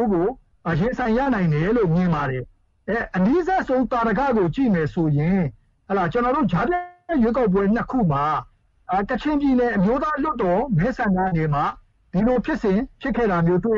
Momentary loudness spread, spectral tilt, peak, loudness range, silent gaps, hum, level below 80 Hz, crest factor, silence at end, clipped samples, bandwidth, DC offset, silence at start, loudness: 7 LU; -9 dB/octave; -8 dBFS; 1 LU; none; none; -40 dBFS; 12 dB; 0 s; under 0.1%; 7.2 kHz; under 0.1%; 0 s; -21 LUFS